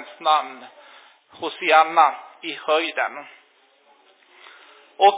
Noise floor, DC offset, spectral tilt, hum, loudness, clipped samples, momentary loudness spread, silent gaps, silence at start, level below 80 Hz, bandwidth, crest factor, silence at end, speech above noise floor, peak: -58 dBFS; under 0.1%; -5.5 dB/octave; none; -20 LUFS; under 0.1%; 18 LU; none; 0 s; -82 dBFS; 4 kHz; 22 dB; 0 s; 37 dB; -2 dBFS